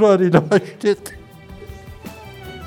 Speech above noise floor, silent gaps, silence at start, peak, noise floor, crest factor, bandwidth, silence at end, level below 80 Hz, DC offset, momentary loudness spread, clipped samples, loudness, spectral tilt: 23 dB; none; 0 s; 0 dBFS; -39 dBFS; 20 dB; 17.5 kHz; 0 s; -46 dBFS; under 0.1%; 23 LU; under 0.1%; -17 LUFS; -7 dB/octave